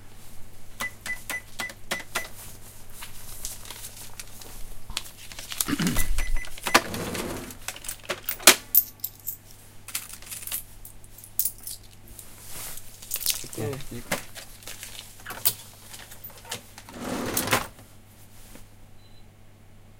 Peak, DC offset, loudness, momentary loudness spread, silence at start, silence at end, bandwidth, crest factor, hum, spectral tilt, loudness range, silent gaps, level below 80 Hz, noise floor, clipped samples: 0 dBFS; under 0.1%; -27 LUFS; 21 LU; 0 s; 0.05 s; 17 kHz; 30 dB; none; -2 dB/octave; 12 LU; none; -40 dBFS; -49 dBFS; under 0.1%